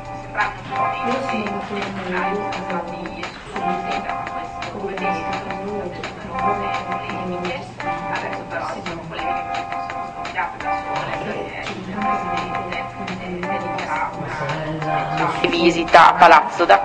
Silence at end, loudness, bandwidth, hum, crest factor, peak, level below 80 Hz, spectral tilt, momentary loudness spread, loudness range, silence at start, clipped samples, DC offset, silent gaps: 0 s; -21 LUFS; 9.8 kHz; none; 20 dB; 0 dBFS; -46 dBFS; -5 dB/octave; 13 LU; 8 LU; 0 s; under 0.1%; under 0.1%; none